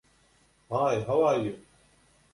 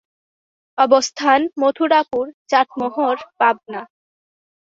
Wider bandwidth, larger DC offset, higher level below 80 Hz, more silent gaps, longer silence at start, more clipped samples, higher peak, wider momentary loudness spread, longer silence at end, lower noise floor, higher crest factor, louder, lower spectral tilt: first, 11.5 kHz vs 7.8 kHz; neither; about the same, -64 dBFS vs -66 dBFS; second, none vs 2.34-2.45 s; about the same, 0.7 s vs 0.75 s; neither; second, -14 dBFS vs -2 dBFS; about the same, 11 LU vs 11 LU; about the same, 0.75 s vs 0.85 s; second, -64 dBFS vs under -90 dBFS; about the same, 16 dB vs 18 dB; second, -27 LUFS vs -18 LUFS; first, -6.5 dB/octave vs -2.5 dB/octave